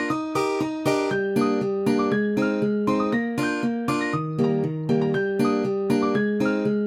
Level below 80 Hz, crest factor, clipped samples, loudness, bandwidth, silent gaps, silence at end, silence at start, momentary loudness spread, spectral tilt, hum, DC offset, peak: -60 dBFS; 14 dB; under 0.1%; -23 LUFS; 15 kHz; none; 0 s; 0 s; 3 LU; -6.5 dB/octave; none; under 0.1%; -10 dBFS